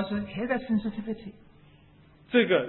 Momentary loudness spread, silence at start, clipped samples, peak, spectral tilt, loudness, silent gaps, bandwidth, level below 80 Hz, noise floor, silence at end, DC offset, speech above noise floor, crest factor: 14 LU; 0 s; under 0.1%; -10 dBFS; -10 dB/octave; -29 LUFS; none; 4.2 kHz; -58 dBFS; -56 dBFS; 0 s; under 0.1%; 29 dB; 18 dB